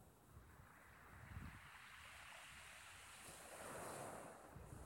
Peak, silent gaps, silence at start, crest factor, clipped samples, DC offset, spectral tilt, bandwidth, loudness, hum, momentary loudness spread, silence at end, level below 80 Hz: -40 dBFS; none; 0 s; 18 dB; under 0.1%; under 0.1%; -3.5 dB/octave; 19 kHz; -57 LUFS; none; 12 LU; 0 s; -70 dBFS